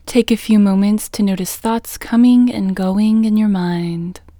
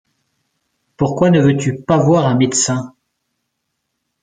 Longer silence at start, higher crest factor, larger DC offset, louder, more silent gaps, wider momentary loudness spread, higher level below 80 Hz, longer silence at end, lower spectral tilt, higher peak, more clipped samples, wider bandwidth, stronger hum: second, 0.05 s vs 1 s; about the same, 14 dB vs 16 dB; neither; about the same, -15 LUFS vs -14 LUFS; neither; about the same, 9 LU vs 9 LU; first, -44 dBFS vs -52 dBFS; second, 0.2 s vs 1.35 s; about the same, -6 dB/octave vs -5.5 dB/octave; about the same, 0 dBFS vs -2 dBFS; neither; first, over 20 kHz vs 9.6 kHz; neither